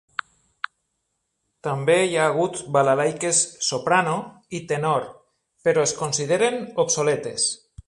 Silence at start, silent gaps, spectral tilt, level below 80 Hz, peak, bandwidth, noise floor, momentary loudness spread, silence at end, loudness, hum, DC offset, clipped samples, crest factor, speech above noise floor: 1.65 s; none; -3 dB/octave; -62 dBFS; -4 dBFS; 11.5 kHz; -76 dBFS; 14 LU; 0.3 s; -22 LUFS; none; under 0.1%; under 0.1%; 20 dB; 54 dB